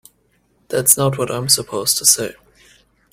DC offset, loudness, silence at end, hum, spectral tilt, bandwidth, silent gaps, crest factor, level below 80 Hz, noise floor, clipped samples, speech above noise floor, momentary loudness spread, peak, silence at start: under 0.1%; -15 LUFS; 0.8 s; none; -2 dB/octave; 17 kHz; none; 20 dB; -54 dBFS; -61 dBFS; under 0.1%; 44 dB; 9 LU; 0 dBFS; 0.7 s